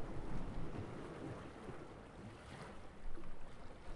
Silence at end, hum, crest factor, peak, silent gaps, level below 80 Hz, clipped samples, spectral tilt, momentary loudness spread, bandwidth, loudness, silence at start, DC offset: 0 s; none; 14 dB; -30 dBFS; none; -52 dBFS; under 0.1%; -6.5 dB/octave; 8 LU; 11 kHz; -52 LUFS; 0 s; under 0.1%